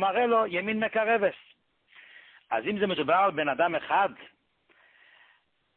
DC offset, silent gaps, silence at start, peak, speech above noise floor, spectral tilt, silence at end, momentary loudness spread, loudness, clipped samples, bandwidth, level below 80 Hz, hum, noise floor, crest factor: under 0.1%; none; 0 s; -12 dBFS; 40 dB; -9 dB/octave; 1.5 s; 6 LU; -26 LUFS; under 0.1%; 4.3 kHz; -72 dBFS; none; -66 dBFS; 18 dB